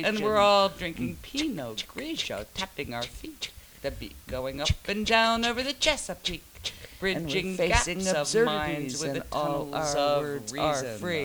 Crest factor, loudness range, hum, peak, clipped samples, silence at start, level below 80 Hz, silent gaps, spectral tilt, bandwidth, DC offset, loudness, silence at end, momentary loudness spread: 22 dB; 7 LU; none; -6 dBFS; under 0.1%; 0 s; -44 dBFS; none; -3.5 dB/octave; over 20 kHz; under 0.1%; -28 LUFS; 0 s; 14 LU